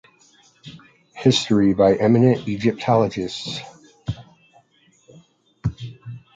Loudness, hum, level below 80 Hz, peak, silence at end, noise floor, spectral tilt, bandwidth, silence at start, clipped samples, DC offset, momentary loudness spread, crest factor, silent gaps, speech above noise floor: -19 LUFS; none; -48 dBFS; -2 dBFS; 0.15 s; -58 dBFS; -6.5 dB/octave; 9.2 kHz; 0.65 s; under 0.1%; under 0.1%; 20 LU; 20 dB; none; 41 dB